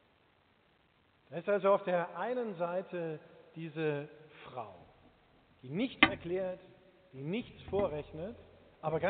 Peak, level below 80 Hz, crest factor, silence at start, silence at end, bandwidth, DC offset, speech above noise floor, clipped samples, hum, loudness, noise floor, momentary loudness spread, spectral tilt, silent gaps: -6 dBFS; -66 dBFS; 30 dB; 1.3 s; 0 s; 4.6 kHz; under 0.1%; 35 dB; under 0.1%; none; -35 LUFS; -70 dBFS; 21 LU; -3.5 dB/octave; none